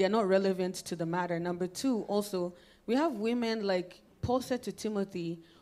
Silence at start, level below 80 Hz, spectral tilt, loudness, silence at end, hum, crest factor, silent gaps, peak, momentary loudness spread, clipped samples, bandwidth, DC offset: 0 s; -64 dBFS; -5.5 dB/octave; -33 LUFS; 0.2 s; none; 16 dB; none; -16 dBFS; 10 LU; under 0.1%; 15.5 kHz; under 0.1%